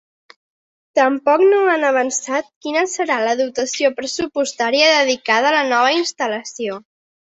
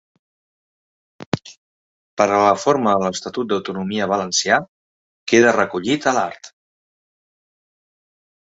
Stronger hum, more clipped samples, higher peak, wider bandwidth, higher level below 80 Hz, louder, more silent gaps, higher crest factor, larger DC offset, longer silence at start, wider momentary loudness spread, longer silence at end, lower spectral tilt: neither; neither; about the same, -2 dBFS vs -2 dBFS; about the same, 8.2 kHz vs 8.2 kHz; about the same, -64 dBFS vs -60 dBFS; about the same, -17 LUFS vs -18 LUFS; second, 2.56-2.61 s vs 1.26-1.32 s, 1.57-2.17 s, 4.69-5.26 s; about the same, 16 dB vs 20 dB; neither; second, 0.95 s vs 1.2 s; second, 10 LU vs 13 LU; second, 0.6 s vs 2 s; second, -1.5 dB/octave vs -4 dB/octave